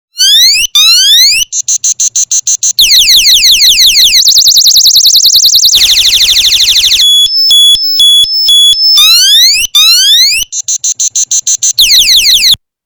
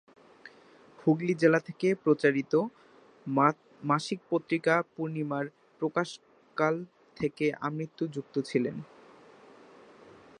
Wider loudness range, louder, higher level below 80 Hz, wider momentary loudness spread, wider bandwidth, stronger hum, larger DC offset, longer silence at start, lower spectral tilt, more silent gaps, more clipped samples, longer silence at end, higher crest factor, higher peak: second, 2 LU vs 6 LU; first, -2 LUFS vs -30 LUFS; first, -36 dBFS vs -74 dBFS; second, 6 LU vs 13 LU; first, over 20 kHz vs 10.5 kHz; neither; neither; second, 0.15 s vs 0.45 s; second, 4.5 dB/octave vs -6.5 dB/octave; neither; first, 4% vs under 0.1%; second, 0.3 s vs 1.55 s; second, 6 dB vs 24 dB; first, 0 dBFS vs -8 dBFS